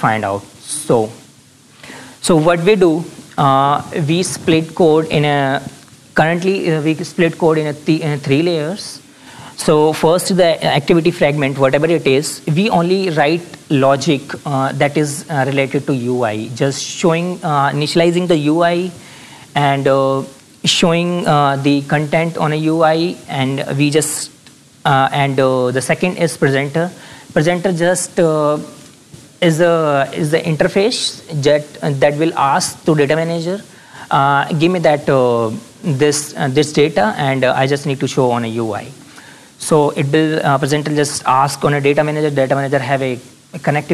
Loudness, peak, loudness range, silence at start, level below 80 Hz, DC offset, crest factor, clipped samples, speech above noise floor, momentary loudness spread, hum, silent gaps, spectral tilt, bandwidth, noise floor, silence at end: -15 LUFS; -2 dBFS; 2 LU; 0 s; -52 dBFS; under 0.1%; 12 dB; under 0.1%; 31 dB; 9 LU; none; none; -5 dB/octave; 14.5 kHz; -45 dBFS; 0 s